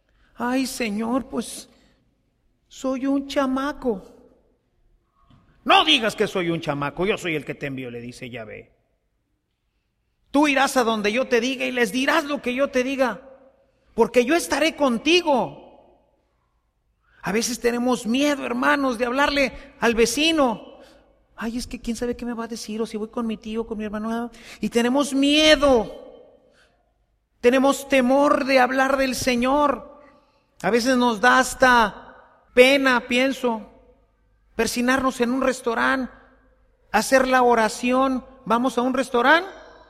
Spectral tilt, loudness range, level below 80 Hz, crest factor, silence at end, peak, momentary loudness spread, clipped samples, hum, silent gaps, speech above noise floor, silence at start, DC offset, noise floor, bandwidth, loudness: -3.5 dB/octave; 8 LU; -50 dBFS; 22 dB; 0.2 s; 0 dBFS; 14 LU; under 0.1%; none; none; 52 dB; 0.4 s; under 0.1%; -72 dBFS; 15.5 kHz; -21 LUFS